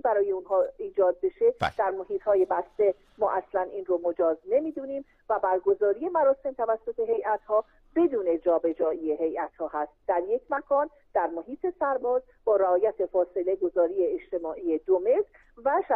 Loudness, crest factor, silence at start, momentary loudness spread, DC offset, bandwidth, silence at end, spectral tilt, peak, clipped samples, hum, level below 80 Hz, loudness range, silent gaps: -27 LUFS; 14 dB; 0.05 s; 8 LU; under 0.1%; 6 kHz; 0 s; -7.5 dB/octave; -12 dBFS; under 0.1%; none; -62 dBFS; 2 LU; none